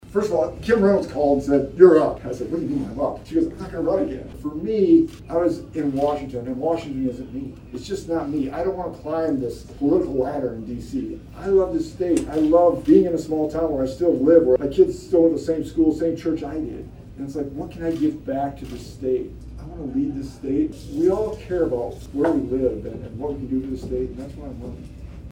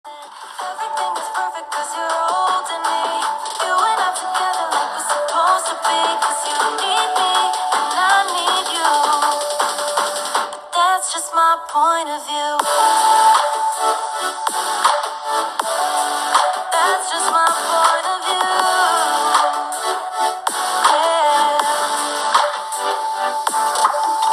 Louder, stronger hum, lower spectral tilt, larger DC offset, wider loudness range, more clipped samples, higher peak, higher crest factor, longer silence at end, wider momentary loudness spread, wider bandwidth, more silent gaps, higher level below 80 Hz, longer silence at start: second, -22 LUFS vs -17 LUFS; neither; first, -7.5 dB/octave vs 1.5 dB/octave; neither; first, 8 LU vs 3 LU; neither; about the same, 0 dBFS vs 0 dBFS; about the same, 22 dB vs 18 dB; about the same, 0 s vs 0 s; first, 16 LU vs 7 LU; about the same, 15.5 kHz vs 15 kHz; neither; first, -42 dBFS vs -72 dBFS; about the same, 0.05 s vs 0.05 s